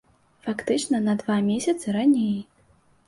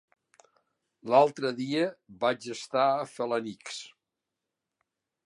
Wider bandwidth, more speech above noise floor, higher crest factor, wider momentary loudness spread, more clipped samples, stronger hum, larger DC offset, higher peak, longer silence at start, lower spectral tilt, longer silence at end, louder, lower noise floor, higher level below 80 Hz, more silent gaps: about the same, 11.5 kHz vs 11.5 kHz; second, 37 dB vs 59 dB; second, 14 dB vs 24 dB; second, 11 LU vs 17 LU; neither; neither; neither; about the same, -10 dBFS vs -8 dBFS; second, 0.45 s vs 1.05 s; about the same, -5.5 dB/octave vs -4.5 dB/octave; second, 0.65 s vs 1.4 s; first, -24 LUFS vs -28 LUFS; second, -60 dBFS vs -87 dBFS; first, -64 dBFS vs -82 dBFS; neither